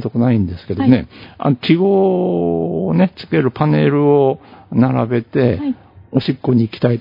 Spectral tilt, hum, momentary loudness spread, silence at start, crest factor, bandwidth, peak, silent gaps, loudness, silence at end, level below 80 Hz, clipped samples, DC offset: -10.5 dB/octave; none; 8 LU; 0 s; 16 dB; 5.4 kHz; 0 dBFS; none; -16 LUFS; 0 s; -50 dBFS; under 0.1%; under 0.1%